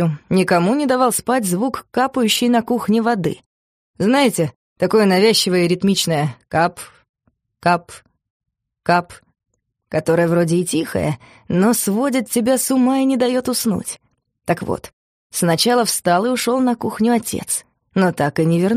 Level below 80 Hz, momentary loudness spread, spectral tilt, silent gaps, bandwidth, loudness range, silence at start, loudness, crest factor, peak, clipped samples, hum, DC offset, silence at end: -54 dBFS; 9 LU; -4.5 dB/octave; 3.46-3.94 s, 4.56-4.76 s, 7.09-7.14 s, 8.30-8.40 s, 14.93-15.30 s; 15.5 kHz; 4 LU; 0 s; -18 LUFS; 16 dB; -2 dBFS; under 0.1%; none; under 0.1%; 0 s